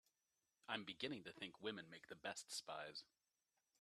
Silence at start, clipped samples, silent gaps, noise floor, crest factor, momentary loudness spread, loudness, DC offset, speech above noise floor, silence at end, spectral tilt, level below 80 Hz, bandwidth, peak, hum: 0.65 s; under 0.1%; none; under -90 dBFS; 26 dB; 7 LU; -51 LUFS; under 0.1%; over 38 dB; 0.75 s; -2.5 dB/octave; under -90 dBFS; 13 kHz; -28 dBFS; none